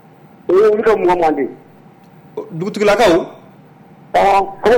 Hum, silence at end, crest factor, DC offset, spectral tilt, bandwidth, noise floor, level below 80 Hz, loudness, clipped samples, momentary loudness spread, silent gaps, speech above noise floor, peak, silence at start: none; 0 s; 10 dB; under 0.1%; -5.5 dB/octave; 19 kHz; -43 dBFS; -44 dBFS; -14 LUFS; under 0.1%; 18 LU; none; 30 dB; -6 dBFS; 0.5 s